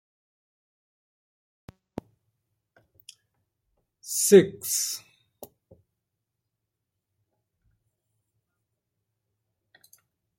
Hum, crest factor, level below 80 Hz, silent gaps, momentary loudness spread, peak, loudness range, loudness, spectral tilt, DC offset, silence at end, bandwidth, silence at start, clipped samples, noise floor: none; 28 dB; -72 dBFS; none; 26 LU; -4 dBFS; 10 LU; -21 LUFS; -4 dB/octave; under 0.1%; 5.4 s; 16.5 kHz; 4.05 s; under 0.1%; -84 dBFS